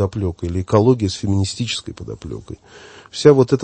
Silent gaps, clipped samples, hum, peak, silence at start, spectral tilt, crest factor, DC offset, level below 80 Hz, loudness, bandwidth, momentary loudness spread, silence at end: none; under 0.1%; none; 0 dBFS; 0 s; -6.5 dB/octave; 18 dB; under 0.1%; -42 dBFS; -17 LUFS; 8.8 kHz; 19 LU; 0 s